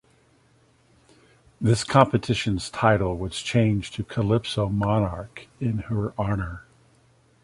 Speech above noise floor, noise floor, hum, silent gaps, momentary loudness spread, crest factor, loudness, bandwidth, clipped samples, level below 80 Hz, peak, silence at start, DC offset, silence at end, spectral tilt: 37 dB; -60 dBFS; none; none; 11 LU; 24 dB; -24 LUFS; 11.5 kHz; under 0.1%; -44 dBFS; -2 dBFS; 1.6 s; under 0.1%; 0.85 s; -6 dB/octave